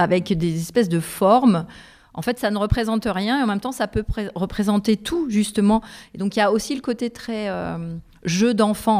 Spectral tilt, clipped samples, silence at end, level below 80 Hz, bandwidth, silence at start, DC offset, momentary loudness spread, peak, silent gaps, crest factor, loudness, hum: -5.5 dB/octave; under 0.1%; 0 s; -40 dBFS; 16 kHz; 0 s; under 0.1%; 10 LU; -4 dBFS; none; 16 dB; -21 LUFS; none